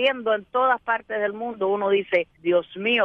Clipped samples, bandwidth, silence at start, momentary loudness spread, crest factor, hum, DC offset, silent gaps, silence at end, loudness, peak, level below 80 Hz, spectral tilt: under 0.1%; 5.6 kHz; 0 s; 5 LU; 16 dB; none; under 0.1%; none; 0 s; -23 LUFS; -8 dBFS; -66 dBFS; -6.5 dB/octave